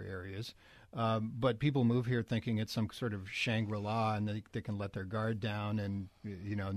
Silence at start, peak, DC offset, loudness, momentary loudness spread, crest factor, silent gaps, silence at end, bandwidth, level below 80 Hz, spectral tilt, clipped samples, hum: 0 s; -18 dBFS; under 0.1%; -36 LUFS; 12 LU; 18 dB; none; 0 s; 13.5 kHz; -64 dBFS; -7 dB/octave; under 0.1%; none